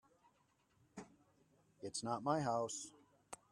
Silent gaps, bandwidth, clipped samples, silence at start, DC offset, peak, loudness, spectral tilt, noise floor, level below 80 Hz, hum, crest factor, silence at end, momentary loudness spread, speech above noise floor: none; 13.5 kHz; under 0.1%; 0.95 s; under 0.1%; -22 dBFS; -41 LUFS; -4.5 dB/octave; -77 dBFS; -82 dBFS; none; 22 dB; 0.15 s; 20 LU; 37 dB